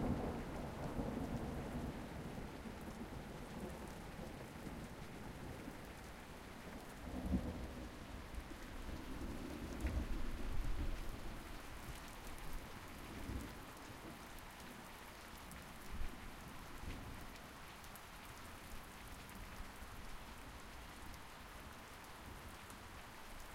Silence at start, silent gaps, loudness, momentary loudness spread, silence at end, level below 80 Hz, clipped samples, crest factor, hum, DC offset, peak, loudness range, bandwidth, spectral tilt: 0 s; none; -50 LUFS; 9 LU; 0 s; -52 dBFS; under 0.1%; 20 dB; none; under 0.1%; -26 dBFS; 6 LU; 16.5 kHz; -5.5 dB/octave